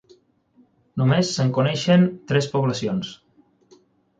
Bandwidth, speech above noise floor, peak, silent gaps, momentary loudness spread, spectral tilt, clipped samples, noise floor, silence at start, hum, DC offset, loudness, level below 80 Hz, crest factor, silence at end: 9.2 kHz; 39 dB; -6 dBFS; none; 10 LU; -6 dB/octave; under 0.1%; -59 dBFS; 0.95 s; none; under 0.1%; -21 LUFS; -58 dBFS; 16 dB; 1.05 s